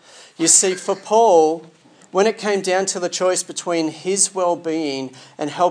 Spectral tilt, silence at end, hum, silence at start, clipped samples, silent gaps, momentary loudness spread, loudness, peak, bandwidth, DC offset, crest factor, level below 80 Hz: -2.5 dB/octave; 0 s; none; 0.2 s; under 0.1%; none; 12 LU; -18 LUFS; 0 dBFS; 10.5 kHz; under 0.1%; 18 dB; -82 dBFS